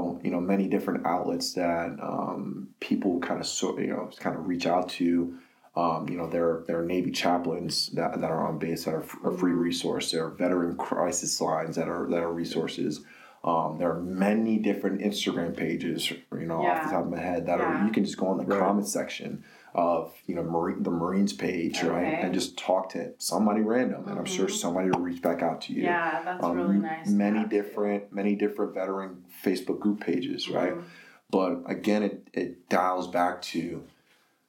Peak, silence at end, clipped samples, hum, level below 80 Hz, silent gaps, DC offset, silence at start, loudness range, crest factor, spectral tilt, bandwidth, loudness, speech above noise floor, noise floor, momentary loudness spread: -8 dBFS; 0.6 s; under 0.1%; none; -66 dBFS; none; under 0.1%; 0 s; 2 LU; 20 dB; -5 dB/octave; 17 kHz; -28 LUFS; 38 dB; -65 dBFS; 7 LU